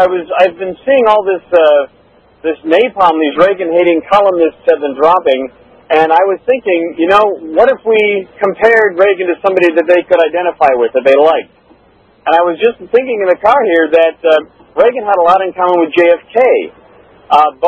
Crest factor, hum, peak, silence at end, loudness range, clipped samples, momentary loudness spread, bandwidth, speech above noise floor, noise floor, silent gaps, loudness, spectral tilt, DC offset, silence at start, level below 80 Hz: 10 dB; none; 0 dBFS; 0 s; 1 LU; 0.7%; 5 LU; 7.2 kHz; 37 dB; -47 dBFS; none; -10 LUFS; -6 dB/octave; under 0.1%; 0 s; -50 dBFS